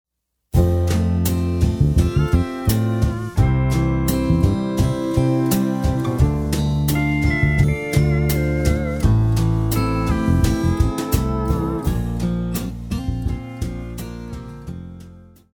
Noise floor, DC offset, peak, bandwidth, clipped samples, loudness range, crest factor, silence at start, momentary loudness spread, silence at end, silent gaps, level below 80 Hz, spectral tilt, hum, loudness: -43 dBFS; under 0.1%; -4 dBFS; 19.5 kHz; under 0.1%; 6 LU; 16 dB; 0.55 s; 10 LU; 0.35 s; none; -26 dBFS; -7 dB/octave; none; -20 LUFS